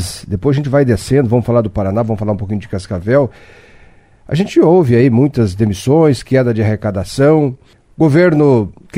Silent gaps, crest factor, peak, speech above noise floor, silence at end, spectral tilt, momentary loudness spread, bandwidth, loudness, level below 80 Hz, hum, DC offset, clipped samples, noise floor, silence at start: none; 12 dB; 0 dBFS; 31 dB; 0 s; -7.5 dB/octave; 10 LU; 15.5 kHz; -13 LUFS; -38 dBFS; none; under 0.1%; under 0.1%; -43 dBFS; 0 s